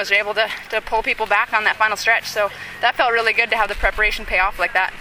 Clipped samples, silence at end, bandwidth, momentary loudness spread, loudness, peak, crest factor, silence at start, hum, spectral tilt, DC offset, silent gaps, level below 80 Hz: under 0.1%; 0 s; 18 kHz; 5 LU; -18 LUFS; -2 dBFS; 18 dB; 0 s; none; -2 dB/octave; under 0.1%; none; -36 dBFS